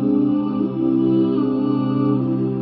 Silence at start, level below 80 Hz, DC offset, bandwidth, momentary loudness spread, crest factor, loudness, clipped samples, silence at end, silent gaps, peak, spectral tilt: 0 s; -54 dBFS; under 0.1%; 4.7 kHz; 3 LU; 10 dB; -19 LUFS; under 0.1%; 0 s; none; -8 dBFS; -13.5 dB/octave